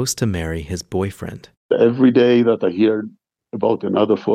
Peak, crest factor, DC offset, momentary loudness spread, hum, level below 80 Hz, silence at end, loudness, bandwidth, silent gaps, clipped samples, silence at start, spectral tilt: -2 dBFS; 16 dB; under 0.1%; 15 LU; none; -44 dBFS; 0 s; -18 LUFS; 15.5 kHz; 1.57-1.69 s; under 0.1%; 0 s; -6 dB/octave